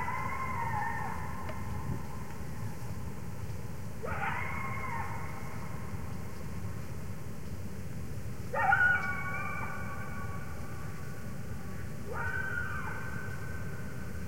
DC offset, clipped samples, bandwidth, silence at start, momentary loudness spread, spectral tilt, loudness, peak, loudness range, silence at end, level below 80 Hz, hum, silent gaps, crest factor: 1%; under 0.1%; 16.5 kHz; 0 s; 9 LU; -5.5 dB/octave; -37 LUFS; -14 dBFS; 8 LU; 0 s; -50 dBFS; none; none; 22 dB